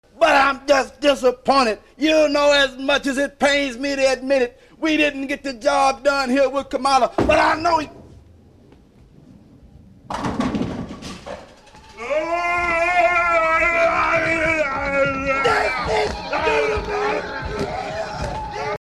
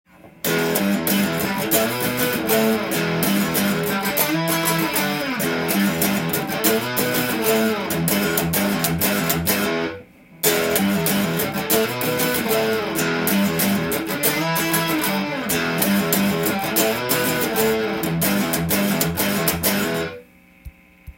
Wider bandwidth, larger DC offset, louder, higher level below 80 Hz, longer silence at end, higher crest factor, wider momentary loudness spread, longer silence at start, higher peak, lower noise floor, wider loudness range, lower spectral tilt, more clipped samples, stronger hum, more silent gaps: second, 13 kHz vs 17 kHz; neither; about the same, -19 LUFS vs -20 LUFS; first, -42 dBFS vs -50 dBFS; about the same, 0.05 s vs 0.05 s; about the same, 16 dB vs 20 dB; first, 11 LU vs 3 LU; about the same, 0.15 s vs 0.25 s; second, -4 dBFS vs 0 dBFS; first, -49 dBFS vs -45 dBFS; first, 10 LU vs 1 LU; about the same, -4 dB/octave vs -4 dB/octave; neither; neither; neither